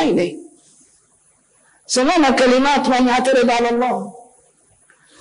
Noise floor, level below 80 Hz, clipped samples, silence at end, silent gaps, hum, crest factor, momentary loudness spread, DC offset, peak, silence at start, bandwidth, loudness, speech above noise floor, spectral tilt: -57 dBFS; -50 dBFS; under 0.1%; 1.1 s; none; none; 10 dB; 11 LU; under 0.1%; -8 dBFS; 0 s; 10.5 kHz; -16 LUFS; 42 dB; -3.5 dB/octave